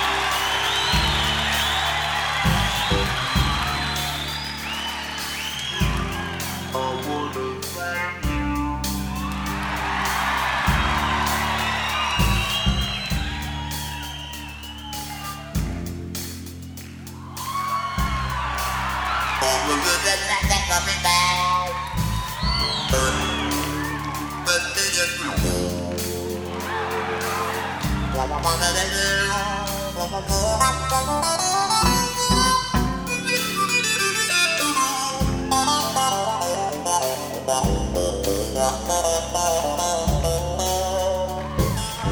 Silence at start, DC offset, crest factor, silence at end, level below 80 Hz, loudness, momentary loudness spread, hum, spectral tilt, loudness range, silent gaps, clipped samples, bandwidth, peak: 0 s; under 0.1%; 18 dB; 0 s; -32 dBFS; -22 LUFS; 9 LU; none; -3 dB/octave; 6 LU; none; under 0.1%; over 20 kHz; -4 dBFS